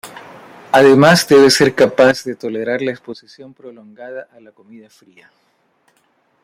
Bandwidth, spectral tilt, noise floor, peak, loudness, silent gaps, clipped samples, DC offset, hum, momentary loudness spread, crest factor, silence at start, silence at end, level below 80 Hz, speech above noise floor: 16 kHz; -4.5 dB/octave; -60 dBFS; -2 dBFS; -12 LUFS; none; under 0.1%; under 0.1%; none; 24 LU; 14 dB; 0.05 s; 2.2 s; -56 dBFS; 46 dB